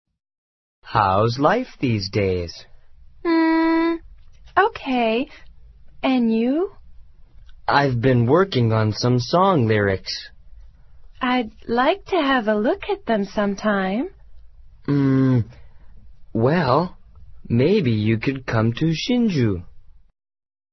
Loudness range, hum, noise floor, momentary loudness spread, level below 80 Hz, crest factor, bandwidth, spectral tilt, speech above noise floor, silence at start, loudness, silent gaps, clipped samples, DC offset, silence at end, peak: 3 LU; none; -44 dBFS; 10 LU; -46 dBFS; 18 dB; 6.2 kHz; -7 dB/octave; 25 dB; 0.85 s; -20 LUFS; none; under 0.1%; under 0.1%; 0.95 s; -2 dBFS